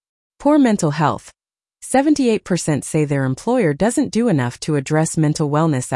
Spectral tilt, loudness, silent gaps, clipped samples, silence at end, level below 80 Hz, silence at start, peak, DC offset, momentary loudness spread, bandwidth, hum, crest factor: -6 dB/octave; -18 LUFS; none; under 0.1%; 0 s; -52 dBFS; 0.4 s; -4 dBFS; under 0.1%; 5 LU; 12 kHz; none; 14 dB